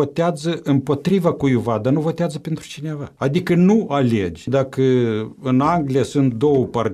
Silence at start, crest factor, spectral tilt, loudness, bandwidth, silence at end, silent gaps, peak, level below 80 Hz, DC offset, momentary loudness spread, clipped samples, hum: 0 s; 16 dB; -7.5 dB/octave; -19 LUFS; 13.5 kHz; 0 s; none; -2 dBFS; -50 dBFS; under 0.1%; 8 LU; under 0.1%; none